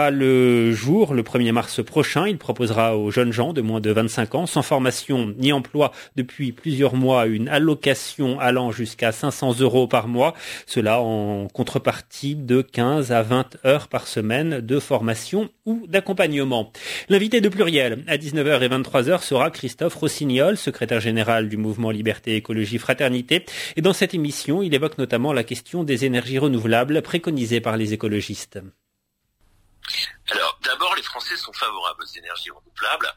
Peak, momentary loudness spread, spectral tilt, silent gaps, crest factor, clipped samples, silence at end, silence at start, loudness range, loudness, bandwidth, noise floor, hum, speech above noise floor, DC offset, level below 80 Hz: -2 dBFS; 8 LU; -5 dB/octave; none; 18 dB; under 0.1%; 0.05 s; 0 s; 4 LU; -21 LUFS; 16 kHz; -74 dBFS; none; 53 dB; under 0.1%; -58 dBFS